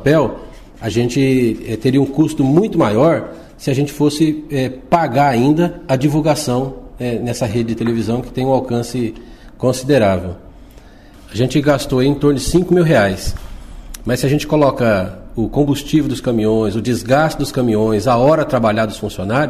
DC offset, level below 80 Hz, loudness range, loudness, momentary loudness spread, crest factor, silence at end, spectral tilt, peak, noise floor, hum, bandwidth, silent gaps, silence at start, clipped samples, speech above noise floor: 0.2%; -36 dBFS; 3 LU; -16 LUFS; 10 LU; 12 dB; 0 s; -6.5 dB/octave; -2 dBFS; -40 dBFS; none; 15.5 kHz; none; 0 s; under 0.1%; 25 dB